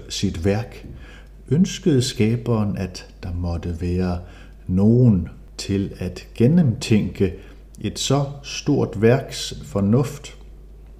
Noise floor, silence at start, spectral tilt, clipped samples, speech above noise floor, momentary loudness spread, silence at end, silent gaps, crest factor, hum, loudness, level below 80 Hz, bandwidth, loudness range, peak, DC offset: -41 dBFS; 0 s; -6.5 dB/octave; under 0.1%; 21 dB; 15 LU; 0 s; none; 16 dB; none; -21 LUFS; -40 dBFS; 14.5 kHz; 3 LU; -4 dBFS; under 0.1%